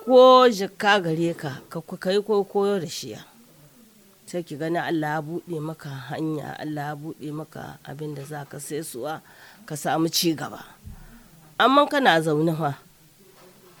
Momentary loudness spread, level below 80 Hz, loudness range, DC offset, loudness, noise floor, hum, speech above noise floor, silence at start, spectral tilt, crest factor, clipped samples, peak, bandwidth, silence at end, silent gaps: 18 LU; -60 dBFS; 10 LU; under 0.1%; -23 LUFS; -54 dBFS; none; 31 dB; 0 s; -4.5 dB/octave; 22 dB; under 0.1%; -2 dBFS; over 20 kHz; 1.05 s; none